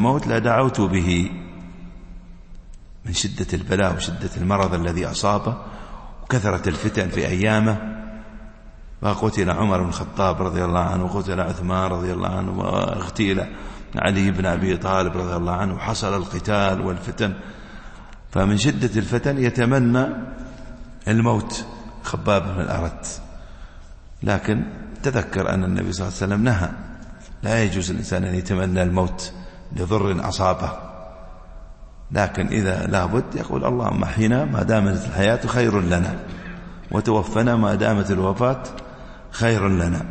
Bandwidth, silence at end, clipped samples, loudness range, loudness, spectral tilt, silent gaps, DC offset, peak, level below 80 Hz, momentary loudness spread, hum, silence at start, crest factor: 8.8 kHz; 0 s; under 0.1%; 4 LU; -22 LUFS; -6 dB/octave; none; under 0.1%; -4 dBFS; -38 dBFS; 17 LU; none; 0 s; 18 dB